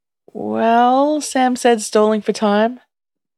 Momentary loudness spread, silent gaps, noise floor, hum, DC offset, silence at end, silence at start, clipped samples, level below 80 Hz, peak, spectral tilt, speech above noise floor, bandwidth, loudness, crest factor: 9 LU; none; -85 dBFS; none; under 0.1%; 0.6 s; 0.35 s; under 0.1%; -70 dBFS; -2 dBFS; -4.5 dB/octave; 70 dB; 13 kHz; -16 LUFS; 14 dB